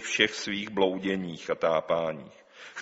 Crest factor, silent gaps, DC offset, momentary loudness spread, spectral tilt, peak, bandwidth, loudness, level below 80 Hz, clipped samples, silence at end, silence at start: 24 dB; none; under 0.1%; 15 LU; -2 dB/octave; -6 dBFS; 8 kHz; -28 LUFS; -66 dBFS; under 0.1%; 0 s; 0 s